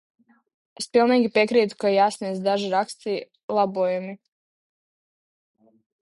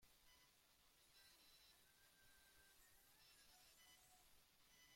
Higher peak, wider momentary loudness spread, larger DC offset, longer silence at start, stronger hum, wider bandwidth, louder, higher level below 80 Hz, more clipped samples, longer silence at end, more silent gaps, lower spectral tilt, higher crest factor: first, -6 dBFS vs -58 dBFS; first, 11 LU vs 1 LU; neither; first, 0.8 s vs 0 s; neither; second, 11.5 kHz vs 16.5 kHz; first, -22 LUFS vs -69 LUFS; first, -72 dBFS vs -86 dBFS; neither; first, 1.9 s vs 0 s; first, 3.43-3.48 s vs none; first, -5 dB/octave vs -0.5 dB/octave; about the same, 18 dB vs 14 dB